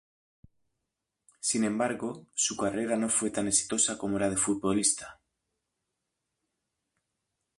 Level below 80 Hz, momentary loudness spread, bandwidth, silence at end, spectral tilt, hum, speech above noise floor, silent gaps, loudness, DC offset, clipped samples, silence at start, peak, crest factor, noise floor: -64 dBFS; 8 LU; 11.5 kHz; 2.45 s; -3 dB/octave; none; 56 dB; none; -28 LUFS; under 0.1%; under 0.1%; 1.45 s; -12 dBFS; 20 dB; -85 dBFS